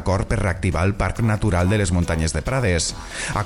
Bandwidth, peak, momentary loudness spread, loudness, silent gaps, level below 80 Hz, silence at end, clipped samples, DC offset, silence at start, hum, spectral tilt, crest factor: 12.5 kHz; -8 dBFS; 3 LU; -21 LUFS; none; -32 dBFS; 0 s; under 0.1%; under 0.1%; 0 s; none; -5.5 dB/octave; 12 dB